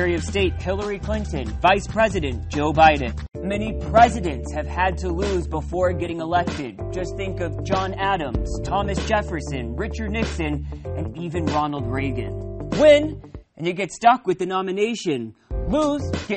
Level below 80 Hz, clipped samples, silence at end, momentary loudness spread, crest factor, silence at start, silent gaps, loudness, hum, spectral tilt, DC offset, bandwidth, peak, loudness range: -32 dBFS; under 0.1%; 0 s; 13 LU; 18 dB; 0 s; none; -22 LUFS; none; -6 dB/octave; under 0.1%; 8.8 kHz; -2 dBFS; 5 LU